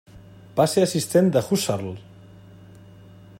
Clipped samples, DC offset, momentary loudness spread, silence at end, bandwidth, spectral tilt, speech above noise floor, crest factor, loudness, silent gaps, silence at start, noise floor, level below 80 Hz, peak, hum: under 0.1%; under 0.1%; 12 LU; 1.4 s; 16.5 kHz; -5.5 dB/octave; 25 dB; 18 dB; -21 LUFS; none; 0.15 s; -46 dBFS; -58 dBFS; -6 dBFS; 50 Hz at -45 dBFS